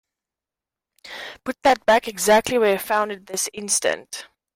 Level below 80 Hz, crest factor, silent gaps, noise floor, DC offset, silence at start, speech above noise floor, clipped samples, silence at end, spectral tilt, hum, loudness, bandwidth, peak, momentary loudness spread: -58 dBFS; 16 dB; none; -89 dBFS; under 0.1%; 1.05 s; 68 dB; under 0.1%; 0.3 s; -2 dB/octave; none; -20 LUFS; 16 kHz; -6 dBFS; 18 LU